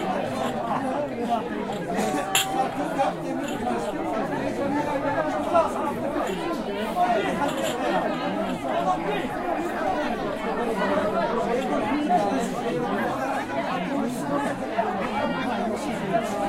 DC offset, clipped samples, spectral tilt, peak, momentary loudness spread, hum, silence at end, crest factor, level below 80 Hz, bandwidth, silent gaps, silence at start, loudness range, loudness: under 0.1%; under 0.1%; -4.5 dB/octave; -6 dBFS; 5 LU; none; 0 s; 18 dB; -50 dBFS; 16 kHz; none; 0 s; 1 LU; -26 LUFS